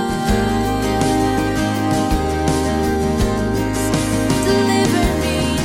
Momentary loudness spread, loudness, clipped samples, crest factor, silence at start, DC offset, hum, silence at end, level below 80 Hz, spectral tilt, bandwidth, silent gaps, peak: 3 LU; -18 LUFS; under 0.1%; 12 dB; 0 s; under 0.1%; none; 0 s; -28 dBFS; -5 dB/octave; 16.5 kHz; none; -4 dBFS